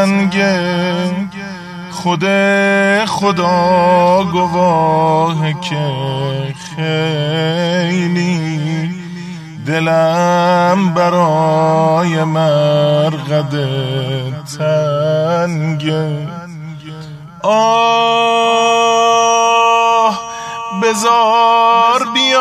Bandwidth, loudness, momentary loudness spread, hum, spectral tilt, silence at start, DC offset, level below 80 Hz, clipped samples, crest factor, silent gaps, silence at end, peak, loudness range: 13.5 kHz; -13 LUFS; 13 LU; none; -5 dB/octave; 0 s; under 0.1%; -54 dBFS; under 0.1%; 12 dB; none; 0 s; 0 dBFS; 5 LU